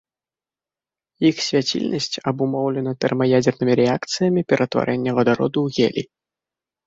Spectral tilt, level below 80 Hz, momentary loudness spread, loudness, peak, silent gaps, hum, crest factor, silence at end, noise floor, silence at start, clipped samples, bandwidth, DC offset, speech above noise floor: -5.5 dB/octave; -58 dBFS; 5 LU; -20 LUFS; -2 dBFS; none; none; 18 dB; 0.8 s; under -90 dBFS; 1.2 s; under 0.1%; 8 kHz; under 0.1%; over 71 dB